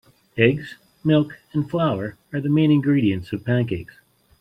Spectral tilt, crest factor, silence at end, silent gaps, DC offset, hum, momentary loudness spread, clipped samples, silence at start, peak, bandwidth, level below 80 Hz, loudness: -9 dB/octave; 20 dB; 0.55 s; none; under 0.1%; none; 12 LU; under 0.1%; 0.35 s; -2 dBFS; 5.2 kHz; -56 dBFS; -21 LUFS